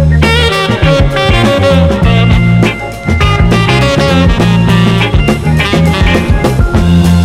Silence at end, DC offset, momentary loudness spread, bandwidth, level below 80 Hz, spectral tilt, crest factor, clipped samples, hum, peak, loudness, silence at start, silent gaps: 0 s; under 0.1%; 3 LU; 14 kHz; -16 dBFS; -6.5 dB/octave; 8 dB; 0.9%; none; 0 dBFS; -8 LUFS; 0 s; none